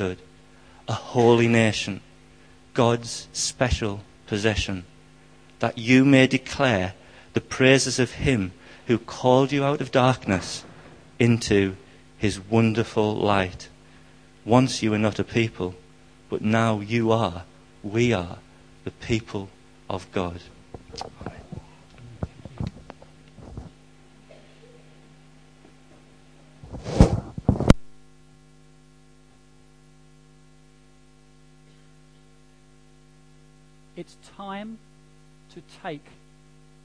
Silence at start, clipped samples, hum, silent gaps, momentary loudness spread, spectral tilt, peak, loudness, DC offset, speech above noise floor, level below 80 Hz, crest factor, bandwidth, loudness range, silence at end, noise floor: 0 s; under 0.1%; none; none; 22 LU; -5.5 dB/octave; -2 dBFS; -23 LUFS; 0.1%; 32 dB; -40 dBFS; 24 dB; 10.5 kHz; 19 LU; 0.85 s; -55 dBFS